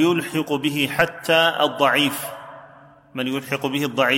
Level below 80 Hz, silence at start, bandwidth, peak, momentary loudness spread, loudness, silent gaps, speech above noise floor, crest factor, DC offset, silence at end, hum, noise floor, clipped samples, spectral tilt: -60 dBFS; 0 s; 17 kHz; -2 dBFS; 14 LU; -20 LUFS; none; 27 dB; 18 dB; under 0.1%; 0 s; none; -47 dBFS; under 0.1%; -4 dB/octave